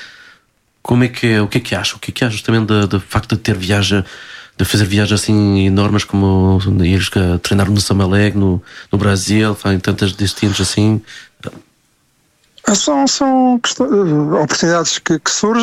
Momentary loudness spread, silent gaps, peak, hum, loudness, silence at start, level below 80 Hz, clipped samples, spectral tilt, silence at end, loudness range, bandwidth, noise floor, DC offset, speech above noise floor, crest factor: 6 LU; none; -2 dBFS; none; -14 LUFS; 0 s; -40 dBFS; under 0.1%; -5 dB/octave; 0 s; 3 LU; 15 kHz; -58 dBFS; under 0.1%; 44 dB; 12 dB